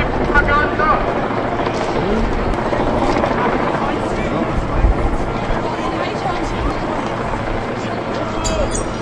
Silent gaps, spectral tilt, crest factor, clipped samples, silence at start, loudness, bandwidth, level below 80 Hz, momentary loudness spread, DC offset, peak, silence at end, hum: none; -5.5 dB/octave; 16 dB; under 0.1%; 0 s; -18 LUFS; 11.5 kHz; -24 dBFS; 6 LU; under 0.1%; 0 dBFS; 0 s; none